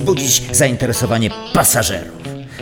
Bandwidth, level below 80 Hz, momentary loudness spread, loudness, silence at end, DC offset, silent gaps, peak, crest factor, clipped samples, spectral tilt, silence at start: over 20 kHz; -38 dBFS; 16 LU; -14 LUFS; 0 s; under 0.1%; none; -2 dBFS; 14 dB; under 0.1%; -3.5 dB/octave; 0 s